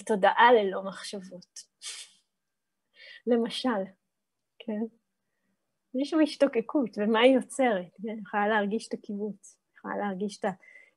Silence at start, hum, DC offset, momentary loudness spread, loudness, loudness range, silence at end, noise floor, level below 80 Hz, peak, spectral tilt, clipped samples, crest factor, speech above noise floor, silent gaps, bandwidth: 0 s; none; under 0.1%; 20 LU; -27 LUFS; 8 LU; 0.4 s; -86 dBFS; -82 dBFS; -8 dBFS; -4.5 dB/octave; under 0.1%; 20 dB; 59 dB; none; 12 kHz